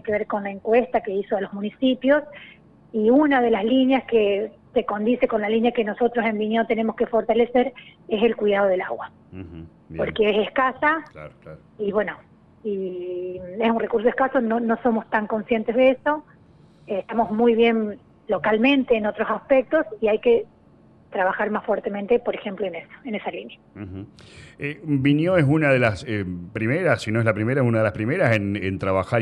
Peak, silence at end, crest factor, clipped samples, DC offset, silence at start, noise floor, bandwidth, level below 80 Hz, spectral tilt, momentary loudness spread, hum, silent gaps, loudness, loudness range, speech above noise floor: -6 dBFS; 0 s; 16 dB; under 0.1%; under 0.1%; 0.05 s; -53 dBFS; 10 kHz; -54 dBFS; -7.5 dB/octave; 14 LU; none; none; -22 LUFS; 5 LU; 31 dB